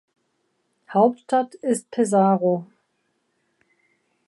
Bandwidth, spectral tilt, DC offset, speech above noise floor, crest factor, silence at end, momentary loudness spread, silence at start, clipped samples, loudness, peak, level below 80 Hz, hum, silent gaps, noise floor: 11.5 kHz; -6.5 dB/octave; under 0.1%; 51 dB; 18 dB; 1.65 s; 8 LU; 0.9 s; under 0.1%; -21 LUFS; -6 dBFS; -78 dBFS; none; none; -71 dBFS